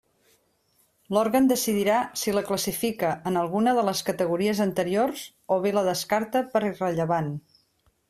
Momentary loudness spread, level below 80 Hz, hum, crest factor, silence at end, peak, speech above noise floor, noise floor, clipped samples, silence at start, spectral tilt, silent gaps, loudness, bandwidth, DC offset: 6 LU; -64 dBFS; none; 16 dB; 0.7 s; -10 dBFS; 43 dB; -67 dBFS; under 0.1%; 1.1 s; -4.5 dB/octave; none; -25 LUFS; 16 kHz; under 0.1%